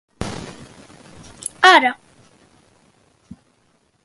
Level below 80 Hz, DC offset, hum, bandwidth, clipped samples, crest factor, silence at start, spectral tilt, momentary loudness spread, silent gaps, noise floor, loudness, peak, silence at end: -50 dBFS; under 0.1%; none; 12 kHz; under 0.1%; 22 dB; 0.2 s; -2.5 dB/octave; 25 LU; none; -62 dBFS; -15 LUFS; 0 dBFS; 2.1 s